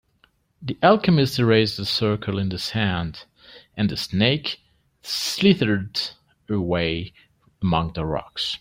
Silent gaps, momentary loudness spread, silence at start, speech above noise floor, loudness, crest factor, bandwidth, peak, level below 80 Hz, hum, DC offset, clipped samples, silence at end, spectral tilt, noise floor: none; 15 LU; 0.6 s; 41 dB; -22 LUFS; 20 dB; 16 kHz; -2 dBFS; -50 dBFS; none; under 0.1%; under 0.1%; 0.05 s; -5.5 dB/octave; -63 dBFS